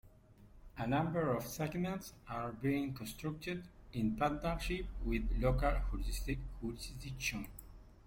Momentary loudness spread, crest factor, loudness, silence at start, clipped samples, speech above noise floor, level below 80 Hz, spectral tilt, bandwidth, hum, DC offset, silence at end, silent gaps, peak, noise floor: 11 LU; 16 dB; -39 LUFS; 0.05 s; under 0.1%; 23 dB; -44 dBFS; -6 dB/octave; 16.5 kHz; none; under 0.1%; 0.1 s; none; -22 dBFS; -61 dBFS